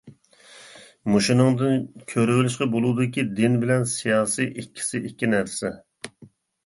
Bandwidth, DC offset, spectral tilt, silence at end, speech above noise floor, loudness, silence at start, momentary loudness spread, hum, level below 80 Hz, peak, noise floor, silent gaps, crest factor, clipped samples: 11.5 kHz; under 0.1%; -5.5 dB/octave; 0.4 s; 30 dB; -23 LUFS; 0.05 s; 13 LU; none; -60 dBFS; -4 dBFS; -52 dBFS; none; 18 dB; under 0.1%